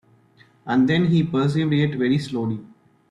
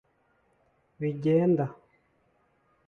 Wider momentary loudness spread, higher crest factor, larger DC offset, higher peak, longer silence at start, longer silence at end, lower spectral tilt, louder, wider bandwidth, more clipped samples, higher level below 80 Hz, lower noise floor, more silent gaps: about the same, 10 LU vs 11 LU; about the same, 14 dB vs 18 dB; neither; first, -8 dBFS vs -14 dBFS; second, 0.65 s vs 1 s; second, 0.45 s vs 1.15 s; second, -8 dB/octave vs -10.5 dB/octave; first, -21 LUFS vs -27 LUFS; first, 10.5 kHz vs 6.4 kHz; neither; first, -58 dBFS vs -70 dBFS; second, -55 dBFS vs -69 dBFS; neither